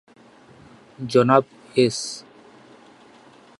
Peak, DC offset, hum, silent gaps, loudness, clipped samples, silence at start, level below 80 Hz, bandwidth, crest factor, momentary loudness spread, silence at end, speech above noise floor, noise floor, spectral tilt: 0 dBFS; under 0.1%; none; none; -20 LUFS; under 0.1%; 1 s; -66 dBFS; 11.5 kHz; 24 dB; 18 LU; 1.4 s; 31 dB; -50 dBFS; -5 dB/octave